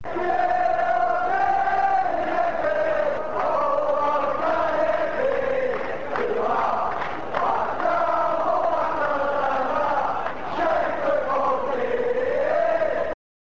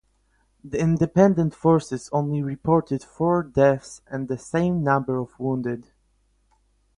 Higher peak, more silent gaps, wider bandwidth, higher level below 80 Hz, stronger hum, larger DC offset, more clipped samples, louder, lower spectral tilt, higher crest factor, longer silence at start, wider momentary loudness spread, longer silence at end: second, -10 dBFS vs -4 dBFS; neither; second, 7.8 kHz vs 11 kHz; about the same, -52 dBFS vs -52 dBFS; neither; first, 2% vs under 0.1%; neither; about the same, -23 LUFS vs -23 LUFS; second, -5.5 dB/octave vs -8 dB/octave; second, 14 dB vs 20 dB; second, 0.05 s vs 0.65 s; second, 4 LU vs 12 LU; second, 0.3 s vs 1.15 s